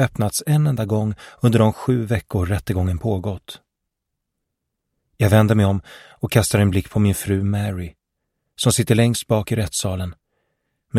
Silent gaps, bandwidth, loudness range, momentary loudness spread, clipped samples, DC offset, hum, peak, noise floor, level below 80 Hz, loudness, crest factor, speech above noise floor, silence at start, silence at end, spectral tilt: none; 15.5 kHz; 4 LU; 12 LU; under 0.1%; under 0.1%; none; -2 dBFS; -79 dBFS; -44 dBFS; -20 LUFS; 18 dB; 61 dB; 0 s; 0 s; -6 dB/octave